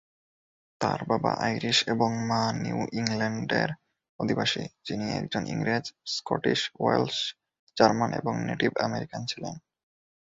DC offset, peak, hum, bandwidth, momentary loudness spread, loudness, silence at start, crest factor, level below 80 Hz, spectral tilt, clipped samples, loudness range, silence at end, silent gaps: under 0.1%; -6 dBFS; none; 8 kHz; 10 LU; -28 LUFS; 0.8 s; 24 dB; -62 dBFS; -4.5 dB/octave; under 0.1%; 3 LU; 0.7 s; 4.09-4.19 s, 7.59-7.67 s